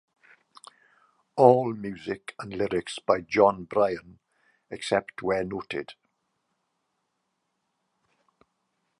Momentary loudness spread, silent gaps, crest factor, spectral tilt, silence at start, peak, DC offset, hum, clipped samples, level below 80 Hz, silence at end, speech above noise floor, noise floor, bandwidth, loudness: 17 LU; none; 26 dB; -6 dB/octave; 1.35 s; -2 dBFS; under 0.1%; none; under 0.1%; -62 dBFS; 3.05 s; 53 dB; -78 dBFS; 11 kHz; -26 LUFS